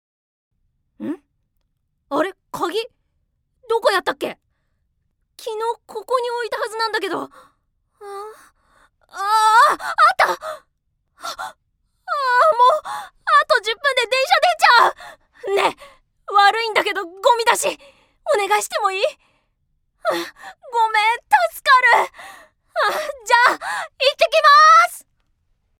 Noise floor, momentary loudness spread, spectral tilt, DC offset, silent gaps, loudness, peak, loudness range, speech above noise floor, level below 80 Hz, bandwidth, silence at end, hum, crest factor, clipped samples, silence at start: -70 dBFS; 20 LU; -0.5 dB/octave; under 0.1%; none; -17 LUFS; 0 dBFS; 10 LU; 52 dB; -64 dBFS; 17.5 kHz; 0.8 s; none; 20 dB; under 0.1%; 1 s